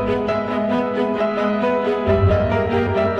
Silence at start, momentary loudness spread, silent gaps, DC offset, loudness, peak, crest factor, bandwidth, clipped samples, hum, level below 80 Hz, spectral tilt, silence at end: 0 s; 4 LU; none; under 0.1%; -19 LUFS; -4 dBFS; 14 dB; 7.2 kHz; under 0.1%; none; -36 dBFS; -8.5 dB/octave; 0 s